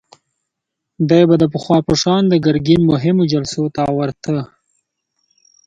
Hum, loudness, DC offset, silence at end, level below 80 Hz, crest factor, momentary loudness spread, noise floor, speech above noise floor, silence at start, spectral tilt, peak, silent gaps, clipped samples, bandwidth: none; -15 LUFS; under 0.1%; 1.2 s; -48 dBFS; 16 dB; 9 LU; -79 dBFS; 65 dB; 1 s; -6.5 dB/octave; 0 dBFS; none; under 0.1%; 9 kHz